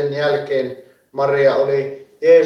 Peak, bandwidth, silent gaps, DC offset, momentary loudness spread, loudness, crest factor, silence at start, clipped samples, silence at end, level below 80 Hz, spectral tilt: -2 dBFS; 6.4 kHz; none; under 0.1%; 14 LU; -18 LUFS; 14 dB; 0 s; under 0.1%; 0 s; -68 dBFS; -6.5 dB/octave